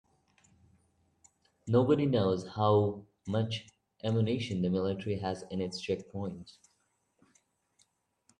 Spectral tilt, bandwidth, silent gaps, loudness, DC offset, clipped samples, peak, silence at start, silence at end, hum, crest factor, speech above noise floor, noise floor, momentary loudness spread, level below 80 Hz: -7.5 dB/octave; 10 kHz; none; -32 LUFS; under 0.1%; under 0.1%; -14 dBFS; 1.65 s; 1.9 s; none; 20 dB; 45 dB; -76 dBFS; 13 LU; -68 dBFS